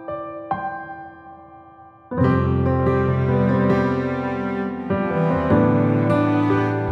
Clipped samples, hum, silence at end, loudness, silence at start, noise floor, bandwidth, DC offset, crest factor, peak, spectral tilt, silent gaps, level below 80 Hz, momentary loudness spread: under 0.1%; none; 0 s; -20 LUFS; 0 s; -45 dBFS; 6.2 kHz; under 0.1%; 16 dB; -6 dBFS; -9.5 dB/octave; none; -42 dBFS; 13 LU